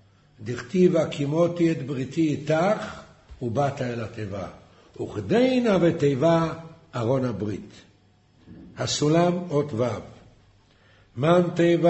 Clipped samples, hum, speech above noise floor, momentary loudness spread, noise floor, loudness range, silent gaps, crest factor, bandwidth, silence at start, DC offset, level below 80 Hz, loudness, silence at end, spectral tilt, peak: under 0.1%; none; 36 dB; 16 LU; -59 dBFS; 3 LU; none; 18 dB; 8.4 kHz; 0.4 s; under 0.1%; -56 dBFS; -24 LUFS; 0 s; -6.5 dB/octave; -6 dBFS